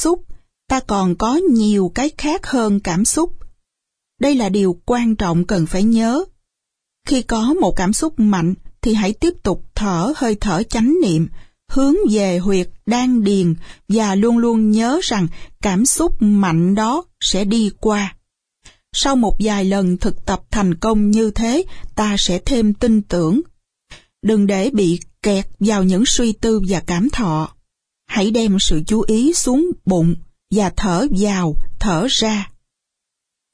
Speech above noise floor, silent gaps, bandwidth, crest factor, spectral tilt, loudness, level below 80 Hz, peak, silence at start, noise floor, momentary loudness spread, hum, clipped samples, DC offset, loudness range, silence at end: 65 dB; none; 11 kHz; 14 dB; -5 dB/octave; -17 LUFS; -30 dBFS; -2 dBFS; 0 s; -80 dBFS; 7 LU; none; under 0.1%; under 0.1%; 2 LU; 1.05 s